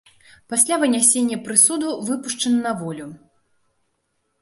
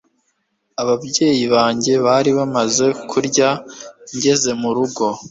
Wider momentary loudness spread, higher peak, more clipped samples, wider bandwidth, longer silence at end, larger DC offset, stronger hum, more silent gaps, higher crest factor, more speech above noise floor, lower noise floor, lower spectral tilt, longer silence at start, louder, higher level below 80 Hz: first, 14 LU vs 10 LU; about the same, 0 dBFS vs -2 dBFS; neither; first, 12 kHz vs 8 kHz; first, 1.25 s vs 0 s; neither; neither; neither; first, 22 dB vs 16 dB; about the same, 51 dB vs 51 dB; about the same, -71 dBFS vs -68 dBFS; about the same, -2.5 dB/octave vs -3.5 dB/octave; second, 0.5 s vs 0.8 s; about the same, -18 LUFS vs -17 LUFS; second, -68 dBFS vs -58 dBFS